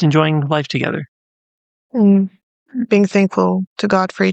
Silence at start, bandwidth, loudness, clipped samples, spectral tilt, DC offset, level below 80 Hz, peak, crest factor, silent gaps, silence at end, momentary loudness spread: 0 s; 8.2 kHz; -16 LUFS; under 0.1%; -7 dB/octave; under 0.1%; -60 dBFS; -2 dBFS; 14 dB; 1.08-1.90 s, 2.43-2.66 s, 3.67-3.76 s; 0 s; 12 LU